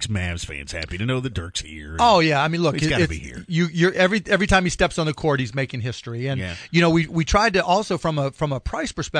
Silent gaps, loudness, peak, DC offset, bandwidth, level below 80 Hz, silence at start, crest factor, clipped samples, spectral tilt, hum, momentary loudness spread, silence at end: none; -21 LUFS; -4 dBFS; under 0.1%; 10.5 kHz; -38 dBFS; 0 s; 18 dB; under 0.1%; -5 dB/octave; none; 12 LU; 0 s